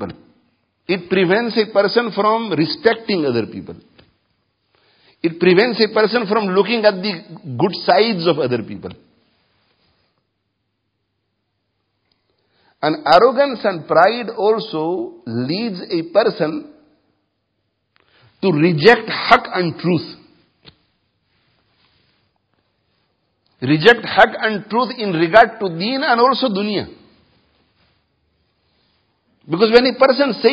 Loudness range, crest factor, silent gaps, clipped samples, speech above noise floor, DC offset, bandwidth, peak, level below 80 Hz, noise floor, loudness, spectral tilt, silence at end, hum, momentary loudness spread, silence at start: 7 LU; 18 dB; none; under 0.1%; 56 dB; under 0.1%; 8 kHz; 0 dBFS; -56 dBFS; -72 dBFS; -16 LUFS; -7 dB/octave; 0 s; none; 13 LU; 0 s